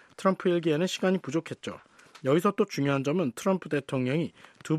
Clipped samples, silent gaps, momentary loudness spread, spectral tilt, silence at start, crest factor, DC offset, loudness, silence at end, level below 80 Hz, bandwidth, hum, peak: under 0.1%; none; 13 LU; -6 dB/octave; 0.2 s; 18 dB; under 0.1%; -28 LUFS; 0 s; -72 dBFS; 14 kHz; none; -10 dBFS